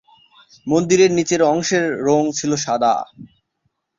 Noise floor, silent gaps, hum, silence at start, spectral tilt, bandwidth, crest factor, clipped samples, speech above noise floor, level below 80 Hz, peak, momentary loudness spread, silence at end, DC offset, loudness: -71 dBFS; none; none; 0.65 s; -4.5 dB/octave; 7.6 kHz; 16 dB; under 0.1%; 54 dB; -58 dBFS; -2 dBFS; 7 LU; 0.75 s; under 0.1%; -17 LUFS